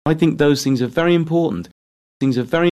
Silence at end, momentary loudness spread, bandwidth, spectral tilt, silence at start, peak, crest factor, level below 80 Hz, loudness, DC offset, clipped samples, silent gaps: 0 s; 7 LU; 13.5 kHz; -6.5 dB/octave; 0.05 s; -4 dBFS; 14 dB; -50 dBFS; -18 LUFS; under 0.1%; under 0.1%; 1.71-2.20 s